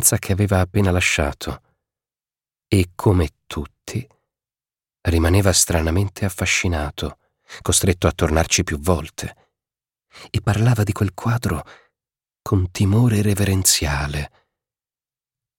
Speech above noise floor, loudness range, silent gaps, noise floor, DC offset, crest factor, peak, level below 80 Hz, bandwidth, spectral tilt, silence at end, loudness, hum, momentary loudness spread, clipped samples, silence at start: over 71 dB; 4 LU; none; under -90 dBFS; under 0.1%; 20 dB; 0 dBFS; -34 dBFS; 17 kHz; -4.5 dB/octave; 1.3 s; -19 LUFS; none; 15 LU; under 0.1%; 0 s